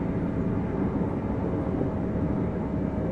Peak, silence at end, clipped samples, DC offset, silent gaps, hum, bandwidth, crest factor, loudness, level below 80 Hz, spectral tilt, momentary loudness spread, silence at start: -14 dBFS; 0 s; under 0.1%; under 0.1%; none; none; 6 kHz; 12 dB; -28 LUFS; -40 dBFS; -10.5 dB/octave; 1 LU; 0 s